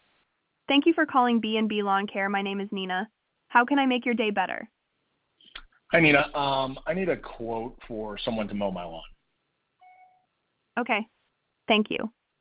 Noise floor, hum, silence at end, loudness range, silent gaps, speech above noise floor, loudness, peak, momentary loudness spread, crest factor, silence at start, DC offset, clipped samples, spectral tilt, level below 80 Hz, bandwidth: -76 dBFS; none; 0.3 s; 10 LU; none; 51 dB; -26 LUFS; -6 dBFS; 18 LU; 22 dB; 0.7 s; under 0.1%; under 0.1%; -2.5 dB/octave; -56 dBFS; 4 kHz